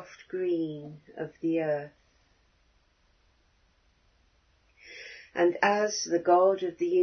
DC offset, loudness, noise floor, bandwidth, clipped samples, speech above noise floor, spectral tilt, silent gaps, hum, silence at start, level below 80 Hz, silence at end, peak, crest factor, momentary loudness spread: under 0.1%; -28 LUFS; -67 dBFS; 6.6 kHz; under 0.1%; 40 dB; -4.5 dB/octave; none; none; 0 s; -70 dBFS; 0 s; -10 dBFS; 20 dB; 21 LU